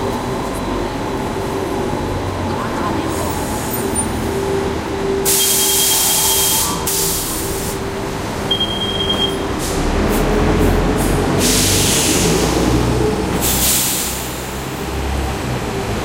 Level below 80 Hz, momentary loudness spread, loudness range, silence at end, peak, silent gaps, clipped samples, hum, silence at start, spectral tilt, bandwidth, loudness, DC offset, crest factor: -28 dBFS; 10 LU; 6 LU; 0 s; -2 dBFS; none; under 0.1%; none; 0 s; -3.5 dB/octave; 16 kHz; -16 LUFS; under 0.1%; 16 dB